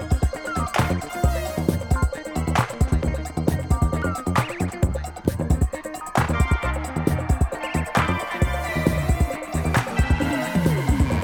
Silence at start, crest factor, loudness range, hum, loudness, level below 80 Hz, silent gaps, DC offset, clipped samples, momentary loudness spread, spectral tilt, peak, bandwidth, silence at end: 0 s; 18 dB; 1 LU; none; -23 LUFS; -28 dBFS; none; under 0.1%; under 0.1%; 5 LU; -6 dB/octave; -4 dBFS; 19 kHz; 0 s